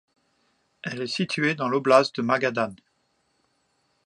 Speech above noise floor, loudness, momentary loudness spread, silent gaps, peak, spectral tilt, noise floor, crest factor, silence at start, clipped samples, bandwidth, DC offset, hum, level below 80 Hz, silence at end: 47 dB; -24 LUFS; 13 LU; none; -2 dBFS; -5 dB/octave; -71 dBFS; 24 dB; 0.85 s; under 0.1%; 11 kHz; under 0.1%; none; -74 dBFS; 1.3 s